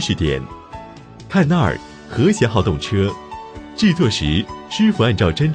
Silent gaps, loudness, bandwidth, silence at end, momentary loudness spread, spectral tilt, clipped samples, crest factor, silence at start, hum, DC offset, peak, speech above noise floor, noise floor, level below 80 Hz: none; -18 LUFS; 9.8 kHz; 0 s; 18 LU; -6 dB/octave; under 0.1%; 16 dB; 0 s; none; under 0.1%; -2 dBFS; 21 dB; -37 dBFS; -36 dBFS